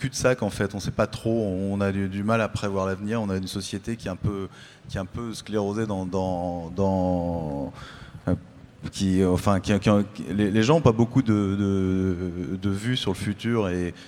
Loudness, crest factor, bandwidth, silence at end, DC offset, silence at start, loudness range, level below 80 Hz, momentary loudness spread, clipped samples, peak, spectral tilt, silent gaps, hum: -25 LUFS; 20 dB; 14.5 kHz; 0 s; under 0.1%; 0 s; 7 LU; -48 dBFS; 12 LU; under 0.1%; -4 dBFS; -6.5 dB/octave; none; none